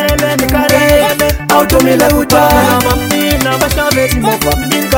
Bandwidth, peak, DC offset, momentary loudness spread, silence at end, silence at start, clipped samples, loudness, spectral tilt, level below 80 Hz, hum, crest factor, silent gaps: over 20 kHz; 0 dBFS; under 0.1%; 4 LU; 0 s; 0 s; 0.3%; -10 LUFS; -4 dB/octave; -22 dBFS; none; 10 dB; none